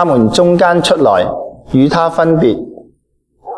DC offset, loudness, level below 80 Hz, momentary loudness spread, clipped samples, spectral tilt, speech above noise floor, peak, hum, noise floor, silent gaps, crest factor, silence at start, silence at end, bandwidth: under 0.1%; -11 LUFS; -42 dBFS; 11 LU; under 0.1%; -6 dB/octave; 49 dB; 0 dBFS; none; -59 dBFS; none; 12 dB; 0 s; 0 s; 11 kHz